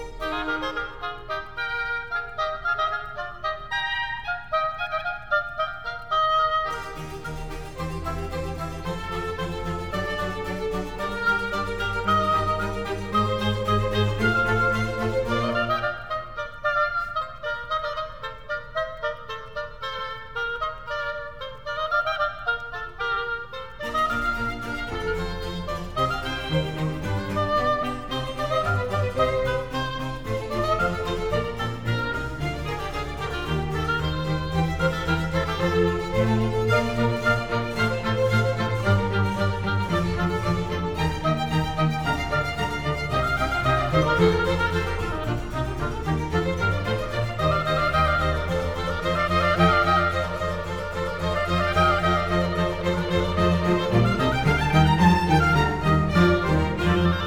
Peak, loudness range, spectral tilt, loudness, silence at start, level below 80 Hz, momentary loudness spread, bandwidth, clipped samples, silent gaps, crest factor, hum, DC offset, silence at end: -6 dBFS; 6 LU; -6 dB/octave; -25 LUFS; 0 s; -38 dBFS; 10 LU; 17.5 kHz; under 0.1%; none; 20 dB; none; 0.7%; 0 s